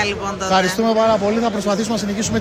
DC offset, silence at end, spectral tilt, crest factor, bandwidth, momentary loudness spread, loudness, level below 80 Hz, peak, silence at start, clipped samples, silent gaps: under 0.1%; 0 s; -4 dB/octave; 16 dB; 15.5 kHz; 5 LU; -18 LUFS; -44 dBFS; -2 dBFS; 0 s; under 0.1%; none